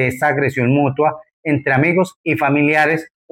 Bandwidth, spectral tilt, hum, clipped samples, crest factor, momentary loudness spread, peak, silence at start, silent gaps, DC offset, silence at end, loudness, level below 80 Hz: 16.5 kHz; -7.5 dB/octave; none; under 0.1%; 12 dB; 6 LU; -4 dBFS; 0 s; 1.33-1.43 s, 2.16-2.24 s; under 0.1%; 0.25 s; -16 LUFS; -56 dBFS